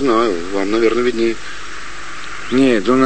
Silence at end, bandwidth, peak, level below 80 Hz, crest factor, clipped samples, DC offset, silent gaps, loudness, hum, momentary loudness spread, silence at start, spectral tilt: 0 s; 8.8 kHz; -2 dBFS; -44 dBFS; 14 dB; under 0.1%; 6%; none; -16 LUFS; none; 16 LU; 0 s; -5 dB/octave